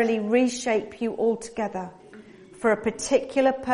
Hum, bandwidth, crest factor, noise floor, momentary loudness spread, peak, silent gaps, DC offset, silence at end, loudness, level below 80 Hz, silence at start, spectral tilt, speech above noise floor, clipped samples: none; 11 kHz; 18 dB; -47 dBFS; 9 LU; -8 dBFS; none; under 0.1%; 0 s; -25 LUFS; -60 dBFS; 0 s; -4.5 dB/octave; 23 dB; under 0.1%